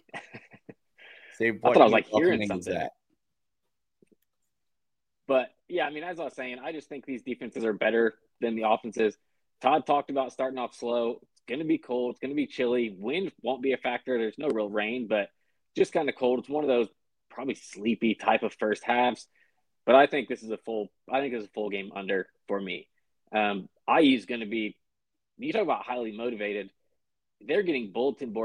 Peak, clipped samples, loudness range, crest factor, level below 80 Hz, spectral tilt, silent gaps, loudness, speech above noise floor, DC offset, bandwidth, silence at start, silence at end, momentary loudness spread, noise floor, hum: -4 dBFS; under 0.1%; 7 LU; 24 dB; -72 dBFS; -5.5 dB/octave; none; -28 LUFS; 60 dB; under 0.1%; 10.5 kHz; 0.15 s; 0 s; 14 LU; -88 dBFS; none